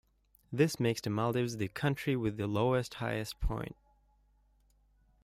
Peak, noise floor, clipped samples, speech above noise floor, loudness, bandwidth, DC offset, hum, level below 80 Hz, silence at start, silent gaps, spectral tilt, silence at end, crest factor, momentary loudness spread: -14 dBFS; -69 dBFS; under 0.1%; 36 dB; -33 LUFS; 16 kHz; under 0.1%; 50 Hz at -60 dBFS; -48 dBFS; 0.5 s; none; -6 dB/octave; 1.55 s; 20 dB; 8 LU